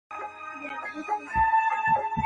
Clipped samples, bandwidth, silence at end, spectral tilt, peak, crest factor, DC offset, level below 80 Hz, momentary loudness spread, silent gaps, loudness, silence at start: under 0.1%; 8.8 kHz; 0 s; -5.5 dB/octave; -14 dBFS; 14 dB; under 0.1%; -48 dBFS; 15 LU; none; -26 LUFS; 0.1 s